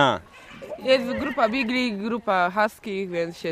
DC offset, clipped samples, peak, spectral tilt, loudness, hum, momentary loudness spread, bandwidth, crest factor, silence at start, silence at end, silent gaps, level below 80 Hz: under 0.1%; under 0.1%; -4 dBFS; -5 dB/octave; -24 LUFS; none; 10 LU; 15.5 kHz; 20 dB; 0 s; 0 s; none; -56 dBFS